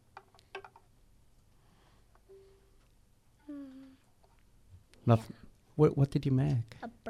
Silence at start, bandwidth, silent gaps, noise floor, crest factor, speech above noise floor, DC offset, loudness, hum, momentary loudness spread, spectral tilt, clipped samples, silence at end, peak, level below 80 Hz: 0.55 s; 10.5 kHz; none; -65 dBFS; 24 dB; 37 dB; under 0.1%; -31 LUFS; 50 Hz at -70 dBFS; 23 LU; -9 dB/octave; under 0.1%; 0 s; -10 dBFS; -60 dBFS